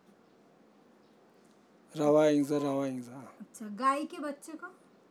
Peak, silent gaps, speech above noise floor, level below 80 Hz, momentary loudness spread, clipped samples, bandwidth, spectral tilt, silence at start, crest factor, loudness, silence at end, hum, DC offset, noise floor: -14 dBFS; none; 31 dB; under -90 dBFS; 22 LU; under 0.1%; 14 kHz; -6 dB/octave; 1.95 s; 20 dB; -30 LUFS; 0.4 s; none; under 0.1%; -62 dBFS